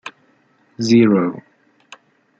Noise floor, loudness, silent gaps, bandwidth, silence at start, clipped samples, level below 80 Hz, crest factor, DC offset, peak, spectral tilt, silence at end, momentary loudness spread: -58 dBFS; -16 LUFS; none; 7.8 kHz; 0.05 s; under 0.1%; -62 dBFS; 18 dB; under 0.1%; -2 dBFS; -6.5 dB/octave; 1 s; 24 LU